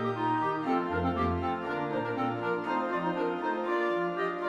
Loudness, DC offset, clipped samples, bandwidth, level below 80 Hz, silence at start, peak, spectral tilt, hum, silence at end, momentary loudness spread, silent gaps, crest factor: -30 LUFS; under 0.1%; under 0.1%; 8.4 kHz; -54 dBFS; 0 s; -18 dBFS; -7.5 dB/octave; none; 0 s; 3 LU; none; 12 dB